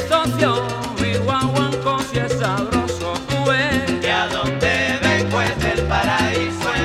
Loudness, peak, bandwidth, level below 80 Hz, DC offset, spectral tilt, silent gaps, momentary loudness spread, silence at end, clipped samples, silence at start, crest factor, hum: -19 LUFS; -2 dBFS; 16 kHz; -36 dBFS; under 0.1%; -5 dB/octave; none; 4 LU; 0 s; under 0.1%; 0 s; 18 dB; none